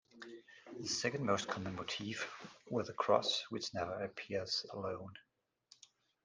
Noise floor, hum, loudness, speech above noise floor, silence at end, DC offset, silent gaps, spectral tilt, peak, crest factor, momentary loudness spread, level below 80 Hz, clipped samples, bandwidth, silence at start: -69 dBFS; none; -39 LUFS; 30 dB; 1.05 s; under 0.1%; none; -3.5 dB/octave; -16 dBFS; 24 dB; 20 LU; -78 dBFS; under 0.1%; 10 kHz; 0.15 s